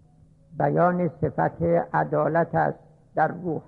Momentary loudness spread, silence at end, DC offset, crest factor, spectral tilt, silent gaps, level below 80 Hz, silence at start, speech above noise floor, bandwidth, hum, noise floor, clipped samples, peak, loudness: 6 LU; 0.05 s; under 0.1%; 14 dB; -11 dB/octave; none; -54 dBFS; 0.5 s; 32 dB; 4.5 kHz; none; -55 dBFS; under 0.1%; -10 dBFS; -24 LUFS